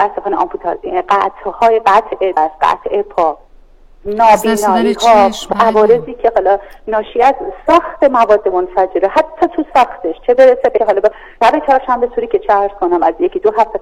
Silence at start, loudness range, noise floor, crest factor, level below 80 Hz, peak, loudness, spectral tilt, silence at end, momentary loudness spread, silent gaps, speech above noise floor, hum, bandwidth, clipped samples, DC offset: 0 s; 2 LU; -41 dBFS; 12 dB; -40 dBFS; 0 dBFS; -12 LUFS; -4.5 dB/octave; 0 s; 8 LU; none; 29 dB; none; 16.5 kHz; under 0.1%; 0.2%